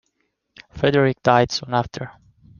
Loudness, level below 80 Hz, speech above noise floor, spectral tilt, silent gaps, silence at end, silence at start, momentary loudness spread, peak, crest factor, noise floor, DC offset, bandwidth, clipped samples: -19 LUFS; -52 dBFS; 53 dB; -5.5 dB/octave; none; 0.5 s; 0.75 s; 15 LU; -2 dBFS; 20 dB; -72 dBFS; under 0.1%; 7.2 kHz; under 0.1%